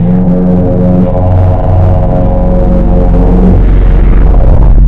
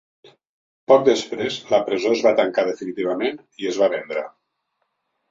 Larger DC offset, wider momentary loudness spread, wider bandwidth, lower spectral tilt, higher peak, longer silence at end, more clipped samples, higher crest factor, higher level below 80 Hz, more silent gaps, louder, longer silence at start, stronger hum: neither; second, 2 LU vs 13 LU; second, 3.3 kHz vs 7.8 kHz; first, -11.5 dB/octave vs -4.5 dB/octave; about the same, 0 dBFS vs -2 dBFS; second, 0 s vs 1 s; first, 9% vs under 0.1%; second, 4 dB vs 20 dB; first, -6 dBFS vs -66 dBFS; neither; first, -8 LUFS vs -20 LUFS; second, 0 s vs 0.9 s; neither